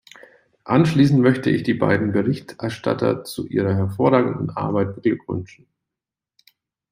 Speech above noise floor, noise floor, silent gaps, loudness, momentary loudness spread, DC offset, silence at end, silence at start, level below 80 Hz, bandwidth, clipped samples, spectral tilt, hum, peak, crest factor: 68 dB; -87 dBFS; none; -20 LUFS; 11 LU; under 0.1%; 1.45 s; 0.65 s; -58 dBFS; 16 kHz; under 0.1%; -7.5 dB/octave; none; -2 dBFS; 18 dB